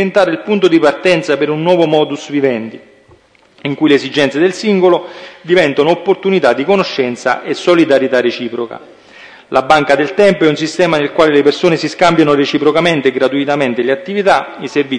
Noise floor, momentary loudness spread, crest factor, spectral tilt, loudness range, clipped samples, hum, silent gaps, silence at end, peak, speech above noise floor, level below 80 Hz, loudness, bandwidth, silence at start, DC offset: -47 dBFS; 7 LU; 12 dB; -5.5 dB/octave; 3 LU; under 0.1%; none; none; 0 s; 0 dBFS; 35 dB; -52 dBFS; -12 LUFS; 10.5 kHz; 0 s; under 0.1%